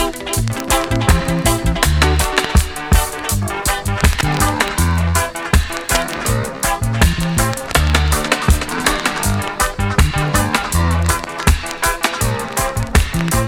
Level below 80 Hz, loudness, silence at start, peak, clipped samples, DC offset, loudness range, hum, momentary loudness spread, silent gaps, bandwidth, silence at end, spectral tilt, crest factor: -22 dBFS; -16 LUFS; 0 s; 0 dBFS; under 0.1%; under 0.1%; 1 LU; none; 4 LU; none; 18 kHz; 0 s; -4 dB/octave; 16 dB